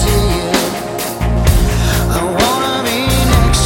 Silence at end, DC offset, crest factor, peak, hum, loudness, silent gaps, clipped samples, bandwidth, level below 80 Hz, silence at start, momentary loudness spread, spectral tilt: 0 s; under 0.1%; 12 dB; 0 dBFS; none; -14 LUFS; none; under 0.1%; 17 kHz; -18 dBFS; 0 s; 6 LU; -4.5 dB/octave